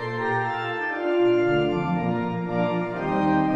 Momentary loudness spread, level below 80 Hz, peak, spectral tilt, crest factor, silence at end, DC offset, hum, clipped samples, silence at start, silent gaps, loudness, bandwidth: 6 LU; -52 dBFS; -12 dBFS; -8.5 dB/octave; 12 dB; 0 s; under 0.1%; none; under 0.1%; 0 s; none; -24 LUFS; 7.4 kHz